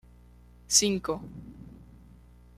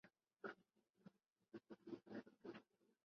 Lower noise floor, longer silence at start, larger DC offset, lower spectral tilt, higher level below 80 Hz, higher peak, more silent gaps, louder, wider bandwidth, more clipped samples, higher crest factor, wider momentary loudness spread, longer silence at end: second, -54 dBFS vs -82 dBFS; first, 0.7 s vs 0.05 s; neither; second, -2 dB/octave vs -4.5 dB/octave; first, -54 dBFS vs under -90 dBFS; first, -6 dBFS vs -38 dBFS; second, none vs 0.90-0.94 s; first, -25 LUFS vs -60 LUFS; first, 15 kHz vs 6.4 kHz; neither; about the same, 26 dB vs 22 dB; first, 25 LU vs 8 LU; first, 0.8 s vs 0.45 s